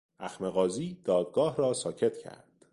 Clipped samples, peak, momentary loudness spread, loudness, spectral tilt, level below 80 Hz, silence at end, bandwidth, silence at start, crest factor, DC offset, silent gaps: under 0.1%; -14 dBFS; 14 LU; -30 LUFS; -5.5 dB/octave; -68 dBFS; 0.4 s; 11.5 kHz; 0.2 s; 16 dB; under 0.1%; none